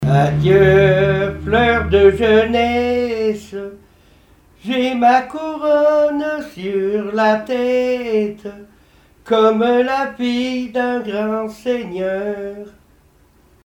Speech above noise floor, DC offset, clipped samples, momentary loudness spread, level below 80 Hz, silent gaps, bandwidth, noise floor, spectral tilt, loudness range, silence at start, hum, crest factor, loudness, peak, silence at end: 36 dB; under 0.1%; under 0.1%; 13 LU; -38 dBFS; none; 14 kHz; -52 dBFS; -7 dB/octave; 6 LU; 0 s; none; 16 dB; -16 LUFS; 0 dBFS; 0.95 s